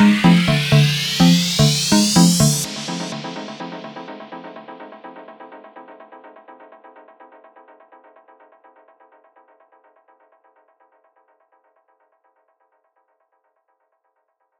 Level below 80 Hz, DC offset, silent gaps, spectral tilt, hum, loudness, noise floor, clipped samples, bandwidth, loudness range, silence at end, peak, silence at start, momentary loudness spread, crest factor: -48 dBFS; under 0.1%; none; -4.5 dB/octave; none; -15 LUFS; -70 dBFS; under 0.1%; 19 kHz; 26 LU; 8.05 s; -2 dBFS; 0 s; 27 LU; 20 dB